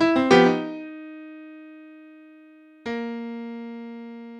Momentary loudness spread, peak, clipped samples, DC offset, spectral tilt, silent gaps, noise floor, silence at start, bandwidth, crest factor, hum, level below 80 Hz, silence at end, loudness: 26 LU; -2 dBFS; under 0.1%; under 0.1%; -5.5 dB/octave; none; -50 dBFS; 0 s; 9.8 kHz; 22 dB; none; -62 dBFS; 0 s; -22 LUFS